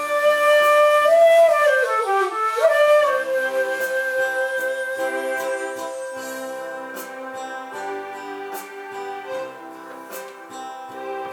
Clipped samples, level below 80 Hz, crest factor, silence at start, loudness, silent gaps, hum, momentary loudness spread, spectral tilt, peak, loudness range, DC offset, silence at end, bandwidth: under 0.1%; -76 dBFS; 14 dB; 0 s; -19 LUFS; none; none; 20 LU; -1.5 dB/octave; -6 dBFS; 16 LU; under 0.1%; 0 s; 20 kHz